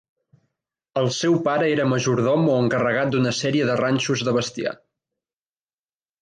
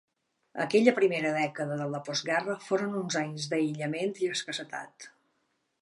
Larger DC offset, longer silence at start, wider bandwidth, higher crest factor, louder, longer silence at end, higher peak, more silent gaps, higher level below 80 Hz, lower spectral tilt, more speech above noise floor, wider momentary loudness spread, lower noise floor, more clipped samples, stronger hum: neither; first, 0.95 s vs 0.55 s; second, 9.8 kHz vs 11.5 kHz; second, 14 dB vs 24 dB; first, -21 LUFS vs -29 LUFS; first, 1.45 s vs 0.75 s; about the same, -8 dBFS vs -6 dBFS; neither; first, -62 dBFS vs -82 dBFS; about the same, -5.5 dB/octave vs -4.5 dB/octave; first, over 69 dB vs 47 dB; second, 8 LU vs 16 LU; first, under -90 dBFS vs -76 dBFS; neither; neither